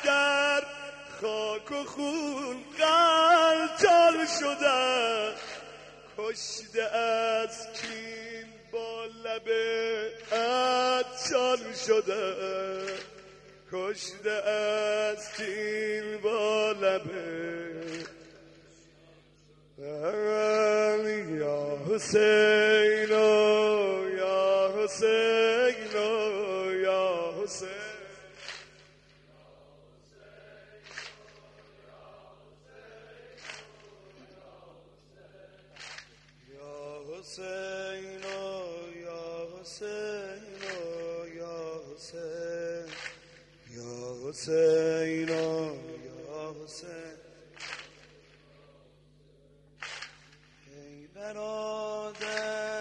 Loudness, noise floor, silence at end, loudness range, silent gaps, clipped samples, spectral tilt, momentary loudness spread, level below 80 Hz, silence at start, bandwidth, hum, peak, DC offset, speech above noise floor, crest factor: -28 LUFS; -61 dBFS; 0 s; 23 LU; none; under 0.1%; -3 dB/octave; 21 LU; -68 dBFS; 0 s; 10.5 kHz; 50 Hz at -65 dBFS; -8 dBFS; under 0.1%; 33 dB; 22 dB